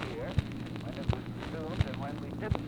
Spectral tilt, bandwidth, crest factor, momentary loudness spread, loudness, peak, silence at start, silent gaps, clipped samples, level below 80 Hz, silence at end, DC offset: -7.5 dB/octave; 14.5 kHz; 20 dB; 5 LU; -36 LUFS; -14 dBFS; 0 s; none; under 0.1%; -44 dBFS; 0 s; under 0.1%